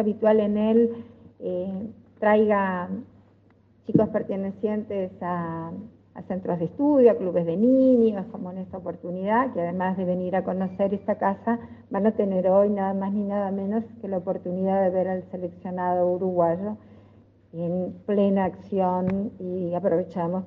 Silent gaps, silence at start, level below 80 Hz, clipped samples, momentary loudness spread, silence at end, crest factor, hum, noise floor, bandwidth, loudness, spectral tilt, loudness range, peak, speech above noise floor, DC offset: none; 0 s; -66 dBFS; under 0.1%; 14 LU; 0 s; 20 dB; none; -58 dBFS; 4.3 kHz; -25 LUFS; -10.5 dB/octave; 5 LU; -6 dBFS; 34 dB; under 0.1%